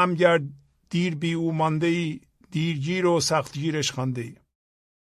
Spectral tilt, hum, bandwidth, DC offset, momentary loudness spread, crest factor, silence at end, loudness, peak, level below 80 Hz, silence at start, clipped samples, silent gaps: -5 dB/octave; none; 13.5 kHz; under 0.1%; 12 LU; 20 dB; 0.7 s; -25 LUFS; -4 dBFS; -62 dBFS; 0 s; under 0.1%; none